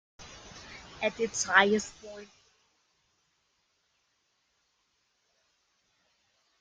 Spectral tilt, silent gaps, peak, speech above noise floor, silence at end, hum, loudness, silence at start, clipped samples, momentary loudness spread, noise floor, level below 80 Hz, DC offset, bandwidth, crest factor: -2.5 dB/octave; none; -6 dBFS; 47 dB; 4.35 s; none; -27 LUFS; 0.2 s; under 0.1%; 25 LU; -75 dBFS; -66 dBFS; under 0.1%; 10 kHz; 30 dB